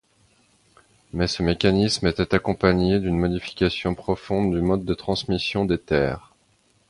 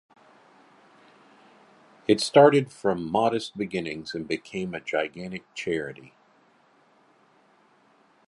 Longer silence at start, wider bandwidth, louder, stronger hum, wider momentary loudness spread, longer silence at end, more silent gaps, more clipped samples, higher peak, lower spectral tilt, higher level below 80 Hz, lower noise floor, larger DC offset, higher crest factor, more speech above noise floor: second, 1.15 s vs 2.1 s; about the same, 11.5 kHz vs 11.5 kHz; about the same, -23 LUFS vs -25 LUFS; neither; second, 7 LU vs 17 LU; second, 0.7 s vs 2.2 s; neither; neither; about the same, -2 dBFS vs -2 dBFS; about the same, -6 dB/octave vs -5.5 dB/octave; first, -40 dBFS vs -64 dBFS; about the same, -63 dBFS vs -61 dBFS; neither; second, 20 dB vs 26 dB; first, 41 dB vs 37 dB